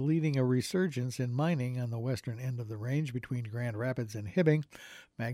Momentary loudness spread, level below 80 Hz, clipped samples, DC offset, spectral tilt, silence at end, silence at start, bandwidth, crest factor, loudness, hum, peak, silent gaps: 9 LU; -68 dBFS; under 0.1%; under 0.1%; -7 dB/octave; 0 s; 0 s; 14.5 kHz; 18 dB; -33 LUFS; none; -14 dBFS; none